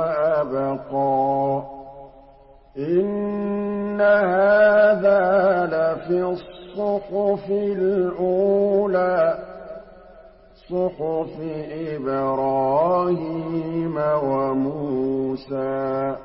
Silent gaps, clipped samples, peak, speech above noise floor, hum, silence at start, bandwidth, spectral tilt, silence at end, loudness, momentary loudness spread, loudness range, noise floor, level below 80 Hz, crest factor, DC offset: none; under 0.1%; -8 dBFS; 28 dB; none; 0 s; 5.6 kHz; -11.5 dB/octave; 0 s; -21 LUFS; 13 LU; 6 LU; -49 dBFS; -54 dBFS; 14 dB; under 0.1%